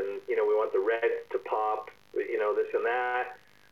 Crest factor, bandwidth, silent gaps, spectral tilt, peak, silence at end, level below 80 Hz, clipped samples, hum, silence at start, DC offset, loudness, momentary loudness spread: 14 dB; 6.4 kHz; none; -4.5 dB/octave; -16 dBFS; 0.35 s; -76 dBFS; under 0.1%; none; 0 s; under 0.1%; -30 LUFS; 8 LU